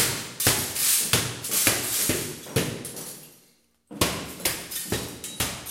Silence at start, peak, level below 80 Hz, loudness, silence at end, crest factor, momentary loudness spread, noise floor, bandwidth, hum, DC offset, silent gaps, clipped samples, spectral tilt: 0 s; -4 dBFS; -50 dBFS; -24 LUFS; 0 s; 24 dB; 14 LU; -62 dBFS; 16.5 kHz; none; under 0.1%; none; under 0.1%; -2 dB/octave